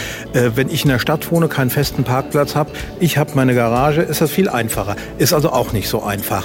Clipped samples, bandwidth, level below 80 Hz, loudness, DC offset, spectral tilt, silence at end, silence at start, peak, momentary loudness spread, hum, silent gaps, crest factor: under 0.1%; 16.5 kHz; -38 dBFS; -17 LUFS; under 0.1%; -5.5 dB/octave; 0 s; 0 s; -2 dBFS; 5 LU; none; none; 14 dB